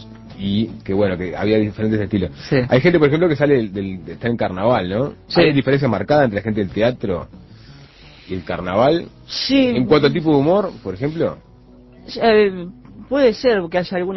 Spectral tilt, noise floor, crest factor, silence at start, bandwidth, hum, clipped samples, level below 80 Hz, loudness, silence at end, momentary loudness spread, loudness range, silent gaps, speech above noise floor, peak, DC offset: -7.5 dB/octave; -45 dBFS; 18 dB; 0 s; 6.2 kHz; none; under 0.1%; -42 dBFS; -18 LUFS; 0 s; 12 LU; 3 LU; none; 27 dB; 0 dBFS; under 0.1%